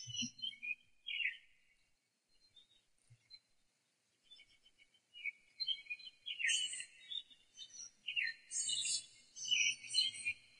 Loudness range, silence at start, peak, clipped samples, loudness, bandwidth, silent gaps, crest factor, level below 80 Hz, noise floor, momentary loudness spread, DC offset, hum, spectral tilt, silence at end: 10 LU; 0 s; -20 dBFS; under 0.1%; -39 LUFS; 11 kHz; none; 24 dB; -86 dBFS; -81 dBFS; 17 LU; under 0.1%; none; 2 dB/octave; 0.2 s